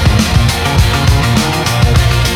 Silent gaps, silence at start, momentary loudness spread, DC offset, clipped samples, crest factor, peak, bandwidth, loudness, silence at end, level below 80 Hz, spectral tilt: none; 0 s; 1 LU; under 0.1%; under 0.1%; 10 dB; 0 dBFS; 17 kHz; -11 LUFS; 0 s; -16 dBFS; -5 dB/octave